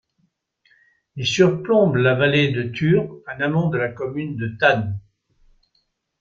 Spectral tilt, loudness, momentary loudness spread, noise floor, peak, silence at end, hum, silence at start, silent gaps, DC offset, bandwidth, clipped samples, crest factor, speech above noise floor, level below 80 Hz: -6 dB/octave; -20 LUFS; 11 LU; -69 dBFS; -2 dBFS; 1.2 s; none; 1.15 s; none; under 0.1%; 7.6 kHz; under 0.1%; 20 dB; 50 dB; -56 dBFS